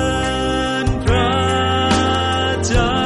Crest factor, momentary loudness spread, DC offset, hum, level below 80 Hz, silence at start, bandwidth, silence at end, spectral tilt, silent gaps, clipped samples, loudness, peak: 12 dB; 3 LU; under 0.1%; none; -26 dBFS; 0 s; 11.5 kHz; 0 s; -4.5 dB/octave; none; under 0.1%; -17 LUFS; -4 dBFS